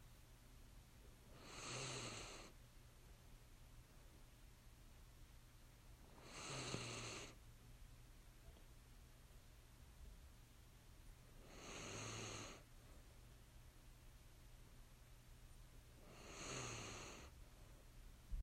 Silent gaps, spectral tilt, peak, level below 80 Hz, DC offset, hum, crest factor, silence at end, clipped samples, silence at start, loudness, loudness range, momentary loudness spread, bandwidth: none; -3 dB/octave; -34 dBFS; -64 dBFS; under 0.1%; none; 24 dB; 0 s; under 0.1%; 0 s; -57 LUFS; 12 LU; 17 LU; 16 kHz